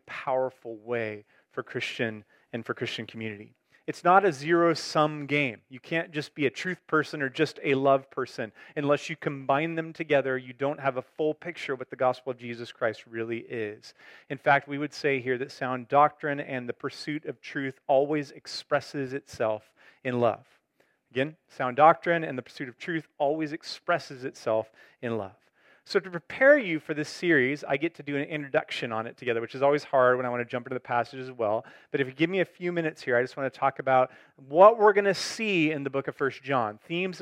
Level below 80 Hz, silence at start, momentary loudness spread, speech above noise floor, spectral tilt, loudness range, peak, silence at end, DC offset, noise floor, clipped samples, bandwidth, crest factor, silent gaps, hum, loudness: -78 dBFS; 0.05 s; 13 LU; 42 dB; -5.5 dB/octave; 8 LU; -4 dBFS; 0 s; under 0.1%; -70 dBFS; under 0.1%; 13 kHz; 22 dB; none; none; -28 LUFS